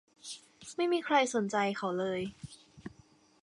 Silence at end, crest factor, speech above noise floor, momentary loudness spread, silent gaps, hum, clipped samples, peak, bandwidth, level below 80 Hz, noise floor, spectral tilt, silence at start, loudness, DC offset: 0.55 s; 20 dB; 32 dB; 22 LU; none; none; under 0.1%; -14 dBFS; 11.5 kHz; -70 dBFS; -63 dBFS; -4 dB/octave; 0.25 s; -32 LUFS; under 0.1%